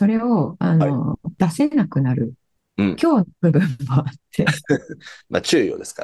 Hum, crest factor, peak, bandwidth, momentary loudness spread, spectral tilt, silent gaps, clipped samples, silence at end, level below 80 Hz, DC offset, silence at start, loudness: none; 18 dB; -2 dBFS; 12.5 kHz; 8 LU; -6.5 dB/octave; none; under 0.1%; 0 s; -54 dBFS; under 0.1%; 0 s; -20 LUFS